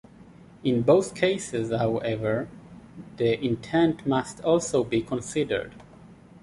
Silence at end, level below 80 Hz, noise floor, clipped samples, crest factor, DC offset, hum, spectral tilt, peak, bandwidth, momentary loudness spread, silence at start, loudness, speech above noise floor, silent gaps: 0.05 s; -56 dBFS; -49 dBFS; under 0.1%; 20 dB; under 0.1%; none; -5.5 dB/octave; -6 dBFS; 11.5 kHz; 10 LU; 0.2 s; -25 LUFS; 25 dB; none